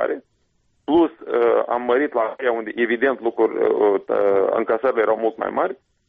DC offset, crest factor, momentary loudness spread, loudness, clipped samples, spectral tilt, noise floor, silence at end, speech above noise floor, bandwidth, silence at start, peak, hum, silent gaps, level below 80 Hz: under 0.1%; 12 dB; 5 LU; -20 LUFS; under 0.1%; -3 dB/octave; -65 dBFS; 0.35 s; 46 dB; 4.5 kHz; 0 s; -8 dBFS; none; none; -62 dBFS